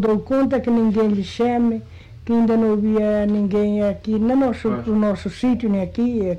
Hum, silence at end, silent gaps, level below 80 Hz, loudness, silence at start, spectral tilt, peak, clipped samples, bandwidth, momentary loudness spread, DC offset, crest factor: none; 0 s; none; -44 dBFS; -19 LUFS; 0 s; -8 dB/octave; -12 dBFS; under 0.1%; 8.6 kHz; 4 LU; 0.2%; 6 dB